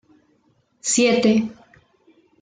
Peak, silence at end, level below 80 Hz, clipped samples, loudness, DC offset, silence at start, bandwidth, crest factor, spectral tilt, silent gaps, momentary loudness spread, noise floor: -6 dBFS; 0.9 s; -62 dBFS; under 0.1%; -19 LUFS; under 0.1%; 0.85 s; 9.6 kHz; 16 dB; -3.5 dB/octave; none; 13 LU; -63 dBFS